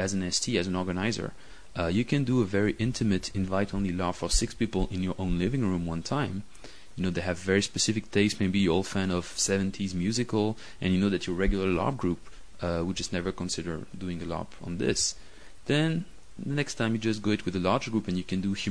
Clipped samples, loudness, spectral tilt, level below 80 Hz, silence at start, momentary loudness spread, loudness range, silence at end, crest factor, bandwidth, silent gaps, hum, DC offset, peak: under 0.1%; -29 LUFS; -5 dB/octave; -42 dBFS; 0 s; 10 LU; 4 LU; 0 s; 18 dB; 11 kHz; none; none; 0.7%; -10 dBFS